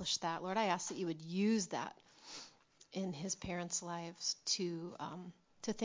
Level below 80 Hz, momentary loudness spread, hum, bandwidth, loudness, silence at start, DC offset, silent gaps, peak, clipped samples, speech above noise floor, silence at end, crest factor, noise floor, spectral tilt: -72 dBFS; 16 LU; none; 7.8 kHz; -39 LUFS; 0 s; under 0.1%; none; -20 dBFS; under 0.1%; 24 dB; 0 s; 20 dB; -64 dBFS; -3.5 dB/octave